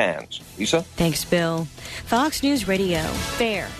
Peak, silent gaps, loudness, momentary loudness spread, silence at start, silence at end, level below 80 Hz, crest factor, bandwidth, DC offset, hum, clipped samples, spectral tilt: -6 dBFS; none; -23 LUFS; 10 LU; 0 s; 0 s; -42 dBFS; 18 dB; 13.5 kHz; under 0.1%; none; under 0.1%; -4.5 dB/octave